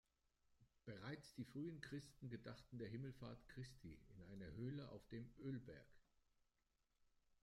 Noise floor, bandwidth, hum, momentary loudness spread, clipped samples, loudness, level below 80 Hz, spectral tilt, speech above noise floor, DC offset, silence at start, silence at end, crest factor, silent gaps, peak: -87 dBFS; 15 kHz; none; 10 LU; under 0.1%; -56 LUFS; -74 dBFS; -7 dB/octave; 32 dB; under 0.1%; 0.5 s; 0.1 s; 18 dB; none; -38 dBFS